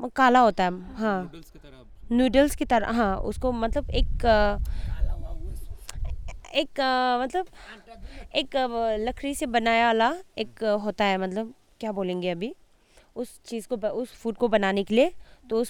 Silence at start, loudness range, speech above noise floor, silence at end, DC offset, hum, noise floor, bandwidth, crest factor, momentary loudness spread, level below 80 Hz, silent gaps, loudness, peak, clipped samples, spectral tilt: 0 s; 5 LU; 33 dB; 0 s; under 0.1%; none; -58 dBFS; 18 kHz; 20 dB; 17 LU; -36 dBFS; none; -25 LUFS; -6 dBFS; under 0.1%; -5 dB/octave